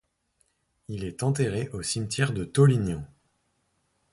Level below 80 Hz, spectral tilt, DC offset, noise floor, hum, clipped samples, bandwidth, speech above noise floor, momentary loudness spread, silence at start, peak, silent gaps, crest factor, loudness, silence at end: -52 dBFS; -5.5 dB/octave; under 0.1%; -73 dBFS; none; under 0.1%; 11.5 kHz; 47 dB; 15 LU; 0.9 s; -8 dBFS; none; 20 dB; -26 LUFS; 1.05 s